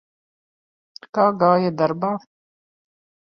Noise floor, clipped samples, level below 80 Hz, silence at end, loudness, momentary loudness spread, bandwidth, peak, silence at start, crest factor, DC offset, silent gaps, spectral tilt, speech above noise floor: under -90 dBFS; under 0.1%; -66 dBFS; 1.05 s; -20 LUFS; 11 LU; 6.6 kHz; -4 dBFS; 1.15 s; 20 dB; under 0.1%; none; -8.5 dB/octave; over 71 dB